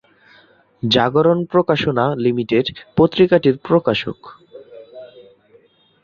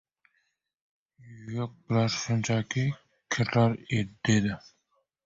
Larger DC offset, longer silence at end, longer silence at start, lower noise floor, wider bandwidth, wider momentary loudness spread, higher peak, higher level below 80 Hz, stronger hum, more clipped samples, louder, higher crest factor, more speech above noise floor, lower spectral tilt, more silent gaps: neither; first, 0.95 s vs 0.65 s; second, 0.85 s vs 1.25 s; second, -53 dBFS vs -75 dBFS; second, 7 kHz vs 7.8 kHz; about the same, 10 LU vs 12 LU; first, -2 dBFS vs -10 dBFS; first, -52 dBFS vs -58 dBFS; neither; neither; first, -17 LUFS vs -28 LUFS; about the same, 18 dB vs 18 dB; second, 37 dB vs 47 dB; first, -7 dB/octave vs -5.5 dB/octave; neither